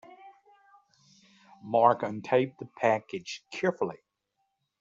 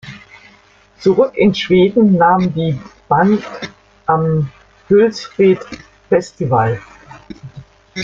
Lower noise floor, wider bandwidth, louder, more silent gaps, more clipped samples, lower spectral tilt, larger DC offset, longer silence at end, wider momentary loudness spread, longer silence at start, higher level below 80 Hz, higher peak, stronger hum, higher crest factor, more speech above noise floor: first, -79 dBFS vs -48 dBFS; about the same, 7.8 kHz vs 7.6 kHz; second, -29 LUFS vs -14 LUFS; neither; neither; second, -6 dB/octave vs -7.5 dB/octave; neither; first, 0.85 s vs 0 s; second, 14 LU vs 21 LU; about the same, 0.1 s vs 0.05 s; second, -76 dBFS vs -48 dBFS; second, -6 dBFS vs -2 dBFS; neither; first, 24 dB vs 14 dB; first, 51 dB vs 35 dB